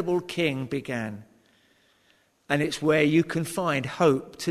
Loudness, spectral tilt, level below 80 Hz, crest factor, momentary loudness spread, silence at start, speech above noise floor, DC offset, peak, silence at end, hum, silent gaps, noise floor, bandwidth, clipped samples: -25 LUFS; -5.5 dB/octave; -62 dBFS; 20 dB; 10 LU; 0 s; 39 dB; under 0.1%; -8 dBFS; 0 s; none; none; -65 dBFS; 13.5 kHz; under 0.1%